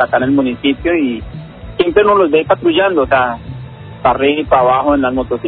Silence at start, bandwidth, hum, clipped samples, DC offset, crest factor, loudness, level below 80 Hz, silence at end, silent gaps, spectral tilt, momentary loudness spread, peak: 0 s; 4.4 kHz; none; under 0.1%; under 0.1%; 14 dB; -13 LUFS; -36 dBFS; 0 s; none; -11 dB/octave; 18 LU; 0 dBFS